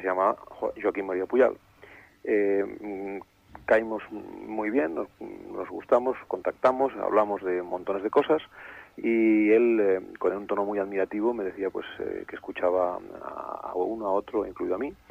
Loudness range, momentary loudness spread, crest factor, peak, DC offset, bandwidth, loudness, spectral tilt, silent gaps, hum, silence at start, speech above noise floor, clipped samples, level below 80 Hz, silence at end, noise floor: 5 LU; 14 LU; 18 dB; -8 dBFS; under 0.1%; 7.6 kHz; -27 LUFS; -7.5 dB/octave; none; none; 0 s; 25 dB; under 0.1%; -64 dBFS; 0.15 s; -52 dBFS